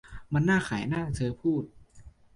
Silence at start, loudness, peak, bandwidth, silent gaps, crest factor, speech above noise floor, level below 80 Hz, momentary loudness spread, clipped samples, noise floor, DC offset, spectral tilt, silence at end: 0.05 s; -29 LUFS; -14 dBFS; 11.5 kHz; none; 16 dB; 25 dB; -50 dBFS; 7 LU; under 0.1%; -52 dBFS; under 0.1%; -7 dB/octave; 0.25 s